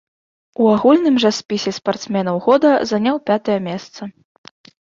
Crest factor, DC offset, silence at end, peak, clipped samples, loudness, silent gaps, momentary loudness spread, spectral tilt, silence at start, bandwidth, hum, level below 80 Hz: 16 dB; under 0.1%; 0.8 s; -2 dBFS; under 0.1%; -16 LUFS; none; 16 LU; -5.5 dB/octave; 0.6 s; 7.6 kHz; none; -60 dBFS